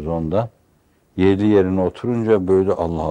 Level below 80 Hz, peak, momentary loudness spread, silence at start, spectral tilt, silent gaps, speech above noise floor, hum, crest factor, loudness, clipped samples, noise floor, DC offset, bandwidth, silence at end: -46 dBFS; -2 dBFS; 7 LU; 0 s; -9 dB/octave; none; 41 dB; none; 16 dB; -18 LUFS; under 0.1%; -59 dBFS; under 0.1%; 8.8 kHz; 0 s